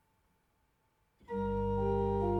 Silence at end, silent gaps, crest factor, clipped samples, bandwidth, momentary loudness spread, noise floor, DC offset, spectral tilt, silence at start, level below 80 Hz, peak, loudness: 0 s; none; 14 dB; under 0.1%; 6 kHz; 7 LU; -75 dBFS; under 0.1%; -10 dB/octave; 1.3 s; -48 dBFS; -20 dBFS; -34 LUFS